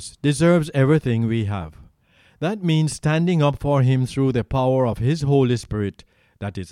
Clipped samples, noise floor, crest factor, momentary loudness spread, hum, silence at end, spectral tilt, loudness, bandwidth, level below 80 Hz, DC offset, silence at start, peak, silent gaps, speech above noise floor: under 0.1%; -57 dBFS; 16 dB; 10 LU; none; 0.05 s; -7 dB/octave; -20 LUFS; 12 kHz; -44 dBFS; under 0.1%; 0 s; -4 dBFS; none; 37 dB